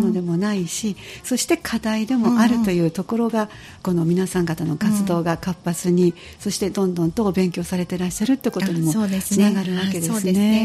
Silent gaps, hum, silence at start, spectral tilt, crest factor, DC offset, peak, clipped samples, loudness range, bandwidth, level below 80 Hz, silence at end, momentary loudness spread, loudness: none; none; 0 s; -5.5 dB/octave; 14 dB; under 0.1%; -6 dBFS; under 0.1%; 1 LU; 14.5 kHz; -50 dBFS; 0 s; 7 LU; -21 LUFS